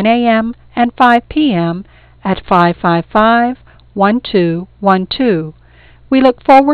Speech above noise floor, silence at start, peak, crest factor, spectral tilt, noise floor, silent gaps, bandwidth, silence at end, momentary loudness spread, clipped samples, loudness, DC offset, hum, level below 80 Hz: 31 dB; 0 s; 0 dBFS; 12 dB; -8 dB/octave; -42 dBFS; none; 6.8 kHz; 0 s; 10 LU; under 0.1%; -12 LUFS; under 0.1%; none; -40 dBFS